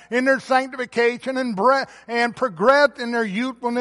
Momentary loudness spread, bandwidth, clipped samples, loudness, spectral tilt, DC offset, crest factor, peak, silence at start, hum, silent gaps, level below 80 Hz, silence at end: 8 LU; 11.5 kHz; under 0.1%; -20 LUFS; -4.5 dB/octave; under 0.1%; 18 dB; -2 dBFS; 0.1 s; none; none; -64 dBFS; 0 s